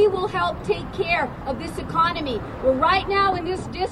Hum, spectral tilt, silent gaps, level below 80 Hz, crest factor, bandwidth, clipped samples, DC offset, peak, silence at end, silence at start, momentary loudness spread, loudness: none; -5.5 dB/octave; none; -40 dBFS; 16 dB; 12.5 kHz; under 0.1%; under 0.1%; -6 dBFS; 0 s; 0 s; 9 LU; -23 LUFS